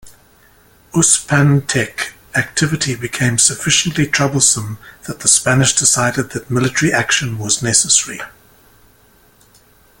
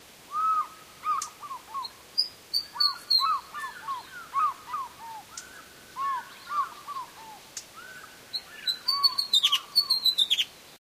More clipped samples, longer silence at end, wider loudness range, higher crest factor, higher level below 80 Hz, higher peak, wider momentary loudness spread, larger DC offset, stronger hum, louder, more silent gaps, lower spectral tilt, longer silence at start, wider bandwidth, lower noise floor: neither; first, 1.7 s vs 0.05 s; second, 3 LU vs 11 LU; about the same, 16 dB vs 20 dB; first, -46 dBFS vs -70 dBFS; first, 0 dBFS vs -10 dBFS; second, 11 LU vs 21 LU; neither; neither; first, -14 LUFS vs -27 LUFS; neither; first, -3 dB/octave vs 1.5 dB/octave; about the same, 0.05 s vs 0 s; about the same, 17 kHz vs 15.5 kHz; about the same, -50 dBFS vs -48 dBFS